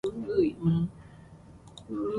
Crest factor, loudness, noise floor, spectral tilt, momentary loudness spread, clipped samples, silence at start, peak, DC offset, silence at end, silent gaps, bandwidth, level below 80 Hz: 16 dB; -29 LUFS; -51 dBFS; -9 dB/octave; 24 LU; under 0.1%; 0.05 s; -14 dBFS; under 0.1%; 0 s; none; 10.5 kHz; -56 dBFS